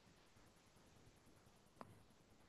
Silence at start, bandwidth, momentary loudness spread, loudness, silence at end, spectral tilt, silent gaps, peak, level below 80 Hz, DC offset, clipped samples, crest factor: 0 s; 12 kHz; 7 LU; -66 LUFS; 0 s; -4.5 dB/octave; none; -36 dBFS; -80 dBFS; under 0.1%; under 0.1%; 32 dB